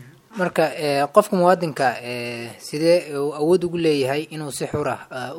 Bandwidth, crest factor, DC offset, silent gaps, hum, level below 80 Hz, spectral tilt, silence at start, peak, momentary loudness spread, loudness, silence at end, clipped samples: 17 kHz; 20 dB; under 0.1%; none; none; -58 dBFS; -5.5 dB/octave; 0 s; 0 dBFS; 12 LU; -21 LUFS; 0 s; under 0.1%